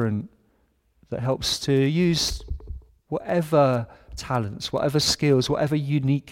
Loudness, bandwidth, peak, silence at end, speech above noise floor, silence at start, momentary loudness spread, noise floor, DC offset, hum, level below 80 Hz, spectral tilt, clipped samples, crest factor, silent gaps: -23 LUFS; 16.5 kHz; -6 dBFS; 0 s; 43 dB; 0 s; 17 LU; -65 dBFS; under 0.1%; none; -42 dBFS; -5 dB/octave; under 0.1%; 18 dB; none